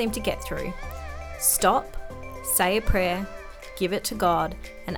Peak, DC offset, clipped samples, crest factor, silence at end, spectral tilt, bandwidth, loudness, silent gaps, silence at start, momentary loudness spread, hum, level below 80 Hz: -6 dBFS; under 0.1%; under 0.1%; 20 dB; 0 s; -3 dB/octave; over 20 kHz; -25 LUFS; none; 0 s; 17 LU; none; -36 dBFS